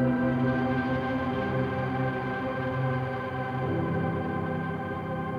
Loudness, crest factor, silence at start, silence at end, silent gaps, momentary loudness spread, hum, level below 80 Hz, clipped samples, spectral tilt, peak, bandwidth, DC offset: -29 LUFS; 14 dB; 0 s; 0 s; none; 6 LU; none; -52 dBFS; under 0.1%; -9 dB/octave; -16 dBFS; 6.4 kHz; under 0.1%